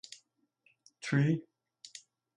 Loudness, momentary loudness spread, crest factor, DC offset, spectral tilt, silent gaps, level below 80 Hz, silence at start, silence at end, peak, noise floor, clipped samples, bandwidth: -32 LUFS; 23 LU; 20 dB; under 0.1%; -6.5 dB/octave; none; -78 dBFS; 0.1 s; 0.4 s; -16 dBFS; -73 dBFS; under 0.1%; 11.5 kHz